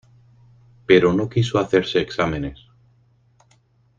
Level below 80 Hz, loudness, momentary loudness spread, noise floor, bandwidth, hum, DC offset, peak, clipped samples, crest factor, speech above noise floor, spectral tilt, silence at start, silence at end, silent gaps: -48 dBFS; -19 LUFS; 14 LU; -59 dBFS; 7.6 kHz; none; under 0.1%; -2 dBFS; under 0.1%; 20 dB; 40 dB; -6.5 dB/octave; 0.9 s; 1.45 s; none